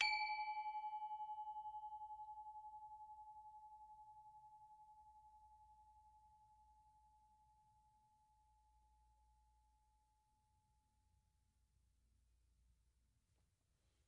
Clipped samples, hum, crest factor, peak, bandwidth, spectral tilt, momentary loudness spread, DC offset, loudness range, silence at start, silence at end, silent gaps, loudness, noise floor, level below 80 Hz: under 0.1%; none; 30 dB; -24 dBFS; 8.2 kHz; 0.5 dB/octave; 22 LU; under 0.1%; 18 LU; 0 s; 4.75 s; none; -49 LUFS; -83 dBFS; -82 dBFS